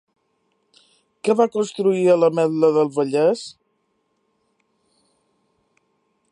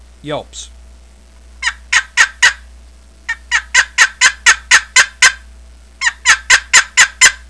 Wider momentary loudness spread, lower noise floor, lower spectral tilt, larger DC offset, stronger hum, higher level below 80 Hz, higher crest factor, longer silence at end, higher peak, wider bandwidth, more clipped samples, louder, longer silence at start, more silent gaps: second, 8 LU vs 17 LU; first, -69 dBFS vs -41 dBFS; first, -6 dB/octave vs 1.5 dB/octave; second, under 0.1% vs 0.3%; neither; second, -78 dBFS vs -40 dBFS; about the same, 18 dB vs 14 dB; first, 2.8 s vs 0.15 s; second, -4 dBFS vs 0 dBFS; about the same, 11 kHz vs 11 kHz; second, under 0.1% vs 0.6%; second, -19 LUFS vs -10 LUFS; first, 1.25 s vs 0.25 s; neither